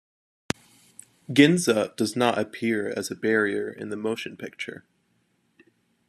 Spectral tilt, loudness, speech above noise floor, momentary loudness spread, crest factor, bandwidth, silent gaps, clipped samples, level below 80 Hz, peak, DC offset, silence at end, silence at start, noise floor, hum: -4.5 dB/octave; -25 LUFS; 45 dB; 17 LU; 24 dB; 13.5 kHz; none; under 0.1%; -66 dBFS; -2 dBFS; under 0.1%; 1.3 s; 1.3 s; -69 dBFS; none